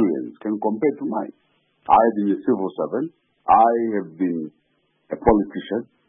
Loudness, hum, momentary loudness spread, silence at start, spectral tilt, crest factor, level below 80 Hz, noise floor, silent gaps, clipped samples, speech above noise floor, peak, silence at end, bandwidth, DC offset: -21 LUFS; none; 16 LU; 0 s; -11.5 dB/octave; 20 dB; -46 dBFS; -67 dBFS; none; under 0.1%; 47 dB; -2 dBFS; 0.25 s; 3.7 kHz; under 0.1%